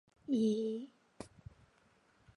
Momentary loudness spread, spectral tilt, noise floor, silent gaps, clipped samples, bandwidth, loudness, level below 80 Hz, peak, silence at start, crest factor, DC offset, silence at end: 24 LU; -7 dB/octave; -70 dBFS; none; under 0.1%; 11 kHz; -36 LUFS; -70 dBFS; -24 dBFS; 0.3 s; 16 dB; under 0.1%; 1.1 s